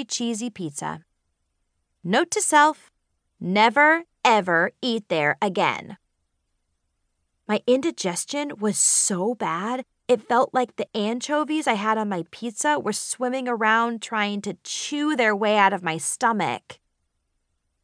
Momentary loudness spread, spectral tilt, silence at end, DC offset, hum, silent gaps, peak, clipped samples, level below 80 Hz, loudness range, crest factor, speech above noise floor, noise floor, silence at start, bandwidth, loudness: 12 LU; -3 dB/octave; 1.1 s; under 0.1%; none; none; -4 dBFS; under 0.1%; -74 dBFS; 5 LU; 20 dB; 51 dB; -74 dBFS; 0 s; 10.5 kHz; -22 LUFS